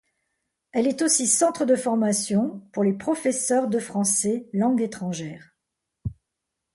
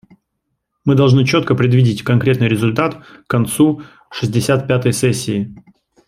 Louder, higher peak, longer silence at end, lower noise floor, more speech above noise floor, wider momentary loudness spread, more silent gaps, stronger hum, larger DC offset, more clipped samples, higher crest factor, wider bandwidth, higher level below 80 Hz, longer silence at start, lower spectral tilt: second, -23 LUFS vs -15 LUFS; second, -8 dBFS vs 0 dBFS; first, 0.65 s vs 0.45 s; first, -82 dBFS vs -72 dBFS; about the same, 59 dB vs 58 dB; first, 13 LU vs 10 LU; neither; neither; neither; neither; about the same, 16 dB vs 14 dB; second, 12 kHz vs 14.5 kHz; second, -56 dBFS vs -50 dBFS; about the same, 0.75 s vs 0.85 s; second, -4 dB/octave vs -6 dB/octave